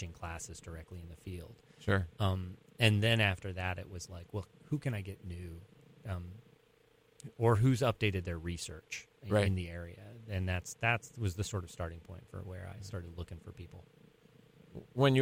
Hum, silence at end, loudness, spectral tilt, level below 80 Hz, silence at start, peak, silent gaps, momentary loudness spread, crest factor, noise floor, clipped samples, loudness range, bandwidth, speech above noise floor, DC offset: none; 0 s; -35 LUFS; -5.5 dB/octave; -56 dBFS; 0 s; -14 dBFS; none; 21 LU; 22 dB; -67 dBFS; under 0.1%; 10 LU; 16 kHz; 32 dB; under 0.1%